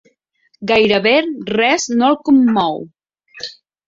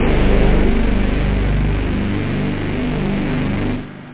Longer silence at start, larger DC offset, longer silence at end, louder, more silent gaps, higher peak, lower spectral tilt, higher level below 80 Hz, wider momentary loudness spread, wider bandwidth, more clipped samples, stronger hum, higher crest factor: first, 0.6 s vs 0 s; neither; first, 0.35 s vs 0 s; first, -14 LUFS vs -19 LUFS; neither; about the same, -2 dBFS vs -2 dBFS; second, -4 dB/octave vs -11 dB/octave; second, -56 dBFS vs -20 dBFS; first, 18 LU vs 5 LU; first, 7.8 kHz vs 4 kHz; neither; second, none vs 50 Hz at -25 dBFS; about the same, 14 dB vs 14 dB